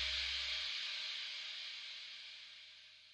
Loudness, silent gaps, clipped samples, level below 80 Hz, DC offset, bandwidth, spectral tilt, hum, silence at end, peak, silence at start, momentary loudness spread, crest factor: -41 LUFS; none; under 0.1%; -64 dBFS; under 0.1%; 13 kHz; 1.5 dB/octave; 50 Hz at -90 dBFS; 0 s; -26 dBFS; 0 s; 16 LU; 18 dB